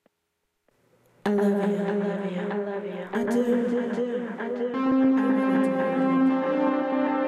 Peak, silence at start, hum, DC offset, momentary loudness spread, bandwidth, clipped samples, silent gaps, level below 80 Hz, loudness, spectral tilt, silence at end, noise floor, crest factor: -12 dBFS; 1.25 s; none; under 0.1%; 8 LU; 11 kHz; under 0.1%; none; -72 dBFS; -25 LUFS; -7.5 dB/octave; 0 s; -77 dBFS; 14 dB